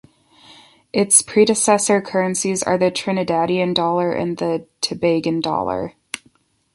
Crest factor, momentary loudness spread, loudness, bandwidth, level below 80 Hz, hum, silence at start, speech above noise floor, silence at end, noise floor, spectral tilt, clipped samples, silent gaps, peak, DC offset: 20 dB; 11 LU; -18 LUFS; 12 kHz; -56 dBFS; none; 0.5 s; 40 dB; 0.6 s; -58 dBFS; -3.5 dB/octave; under 0.1%; none; 0 dBFS; under 0.1%